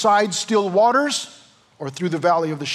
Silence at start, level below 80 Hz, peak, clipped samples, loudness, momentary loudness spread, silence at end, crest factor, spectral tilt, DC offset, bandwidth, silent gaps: 0 s; -78 dBFS; -6 dBFS; under 0.1%; -19 LUFS; 16 LU; 0 s; 14 dB; -4 dB/octave; under 0.1%; 13.5 kHz; none